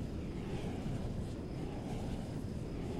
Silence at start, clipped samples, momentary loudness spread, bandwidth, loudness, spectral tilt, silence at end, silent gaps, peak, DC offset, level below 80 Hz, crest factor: 0 s; under 0.1%; 2 LU; 15.5 kHz; -42 LUFS; -7.5 dB/octave; 0 s; none; -28 dBFS; under 0.1%; -46 dBFS; 12 dB